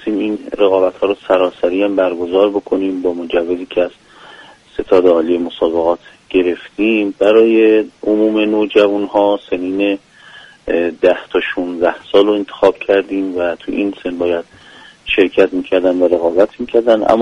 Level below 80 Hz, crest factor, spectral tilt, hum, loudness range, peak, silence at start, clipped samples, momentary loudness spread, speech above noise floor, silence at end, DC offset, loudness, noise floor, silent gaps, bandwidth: -48 dBFS; 14 dB; -6 dB/octave; none; 4 LU; 0 dBFS; 0 s; under 0.1%; 8 LU; 26 dB; 0 s; under 0.1%; -14 LUFS; -40 dBFS; none; 9.4 kHz